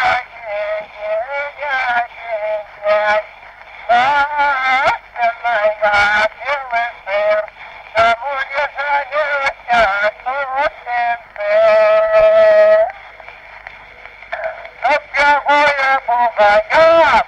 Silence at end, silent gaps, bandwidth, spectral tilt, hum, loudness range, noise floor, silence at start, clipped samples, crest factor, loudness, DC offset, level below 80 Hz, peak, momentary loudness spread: 0 s; none; 9 kHz; -3 dB/octave; none; 4 LU; -37 dBFS; 0 s; under 0.1%; 12 dB; -15 LUFS; under 0.1%; -48 dBFS; -2 dBFS; 14 LU